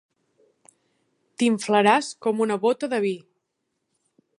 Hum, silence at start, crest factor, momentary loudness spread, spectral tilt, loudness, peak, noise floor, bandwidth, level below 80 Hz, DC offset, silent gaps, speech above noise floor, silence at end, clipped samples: none; 1.4 s; 22 dB; 8 LU; -4.5 dB/octave; -22 LUFS; -4 dBFS; -78 dBFS; 11.5 kHz; -78 dBFS; under 0.1%; none; 56 dB; 1.2 s; under 0.1%